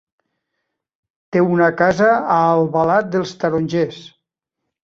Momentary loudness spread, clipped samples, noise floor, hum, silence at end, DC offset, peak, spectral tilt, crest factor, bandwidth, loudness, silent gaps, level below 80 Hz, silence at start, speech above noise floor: 7 LU; under 0.1%; -80 dBFS; none; 0.8 s; under 0.1%; -2 dBFS; -7 dB/octave; 16 dB; 7.6 kHz; -16 LUFS; none; -56 dBFS; 1.3 s; 64 dB